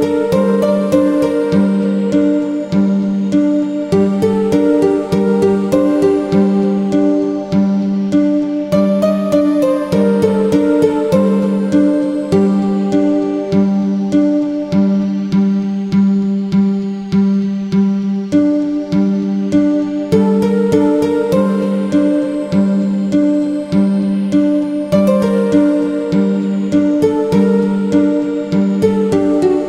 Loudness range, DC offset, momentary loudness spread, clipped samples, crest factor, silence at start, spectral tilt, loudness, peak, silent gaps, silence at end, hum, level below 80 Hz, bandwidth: 2 LU; under 0.1%; 3 LU; under 0.1%; 12 dB; 0 s; -8.5 dB/octave; -14 LUFS; 0 dBFS; none; 0 s; none; -48 dBFS; 11.5 kHz